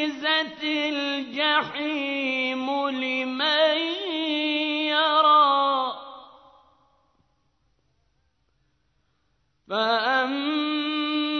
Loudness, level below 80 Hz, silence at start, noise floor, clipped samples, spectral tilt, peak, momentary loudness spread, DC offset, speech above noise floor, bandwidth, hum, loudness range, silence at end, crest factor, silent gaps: -23 LUFS; -74 dBFS; 0 s; -71 dBFS; under 0.1%; -3.5 dB/octave; -8 dBFS; 8 LU; under 0.1%; 46 dB; 6.4 kHz; none; 9 LU; 0 s; 18 dB; none